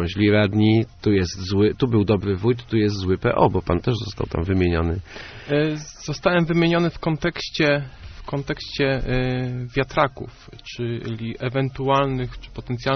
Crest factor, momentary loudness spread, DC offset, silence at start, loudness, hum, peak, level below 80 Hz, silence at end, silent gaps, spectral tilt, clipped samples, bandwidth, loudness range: 18 dB; 12 LU; under 0.1%; 0 s; -22 LUFS; none; -2 dBFS; -40 dBFS; 0 s; none; -5.5 dB/octave; under 0.1%; 6.6 kHz; 5 LU